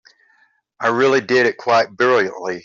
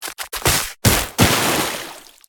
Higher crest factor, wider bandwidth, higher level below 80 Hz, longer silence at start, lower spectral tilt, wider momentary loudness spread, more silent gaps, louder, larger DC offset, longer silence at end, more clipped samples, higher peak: about the same, 16 dB vs 20 dB; second, 7.4 kHz vs 19 kHz; second, -64 dBFS vs -34 dBFS; first, 0.8 s vs 0 s; first, -4.5 dB/octave vs -3 dB/octave; second, 6 LU vs 12 LU; neither; about the same, -17 LUFS vs -17 LUFS; neither; second, 0.05 s vs 0.3 s; neither; second, -4 dBFS vs 0 dBFS